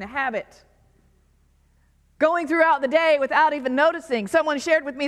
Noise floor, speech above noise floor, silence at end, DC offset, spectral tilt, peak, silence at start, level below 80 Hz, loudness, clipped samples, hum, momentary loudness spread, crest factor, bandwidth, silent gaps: -60 dBFS; 39 dB; 0 s; under 0.1%; -4 dB/octave; -6 dBFS; 0 s; -60 dBFS; -21 LUFS; under 0.1%; none; 7 LU; 18 dB; 12.5 kHz; none